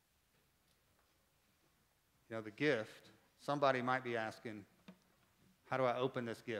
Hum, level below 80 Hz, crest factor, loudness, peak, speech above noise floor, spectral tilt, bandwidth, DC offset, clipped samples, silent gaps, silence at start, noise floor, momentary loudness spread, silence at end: none; -86 dBFS; 24 dB; -39 LUFS; -20 dBFS; 38 dB; -6 dB/octave; 16 kHz; under 0.1%; under 0.1%; none; 2.3 s; -77 dBFS; 16 LU; 0 s